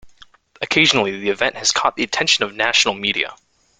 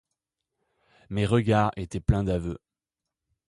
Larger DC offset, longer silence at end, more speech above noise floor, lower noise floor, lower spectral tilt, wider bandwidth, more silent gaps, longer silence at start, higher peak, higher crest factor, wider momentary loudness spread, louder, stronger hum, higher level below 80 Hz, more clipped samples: neither; second, 0.45 s vs 0.9 s; second, 31 dB vs 63 dB; second, -49 dBFS vs -88 dBFS; second, -1.5 dB/octave vs -7.5 dB/octave; second, 10 kHz vs 11.5 kHz; neither; second, 0.05 s vs 1.1 s; first, 0 dBFS vs -8 dBFS; about the same, 18 dB vs 20 dB; second, 7 LU vs 13 LU; first, -17 LUFS vs -26 LUFS; neither; second, -56 dBFS vs -42 dBFS; neither